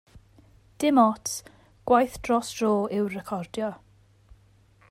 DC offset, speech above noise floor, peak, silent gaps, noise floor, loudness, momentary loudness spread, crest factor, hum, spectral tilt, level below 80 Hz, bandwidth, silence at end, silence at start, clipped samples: under 0.1%; 34 dB; -6 dBFS; none; -58 dBFS; -25 LUFS; 12 LU; 20 dB; none; -5 dB/octave; -56 dBFS; 16 kHz; 1.15 s; 0.15 s; under 0.1%